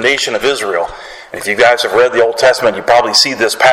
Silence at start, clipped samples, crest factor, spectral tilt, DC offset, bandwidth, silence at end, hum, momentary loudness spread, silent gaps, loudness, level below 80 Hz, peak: 0 s; under 0.1%; 12 dB; -1.5 dB/octave; under 0.1%; 16.5 kHz; 0 s; none; 11 LU; none; -11 LUFS; -48 dBFS; 0 dBFS